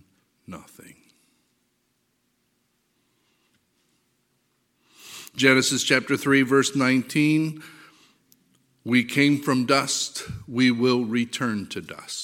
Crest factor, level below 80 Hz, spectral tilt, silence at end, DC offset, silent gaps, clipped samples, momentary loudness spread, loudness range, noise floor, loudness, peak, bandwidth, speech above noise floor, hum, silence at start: 24 dB; -64 dBFS; -4 dB/octave; 0 s; under 0.1%; none; under 0.1%; 21 LU; 3 LU; -71 dBFS; -22 LUFS; 0 dBFS; 16.5 kHz; 49 dB; none; 0.5 s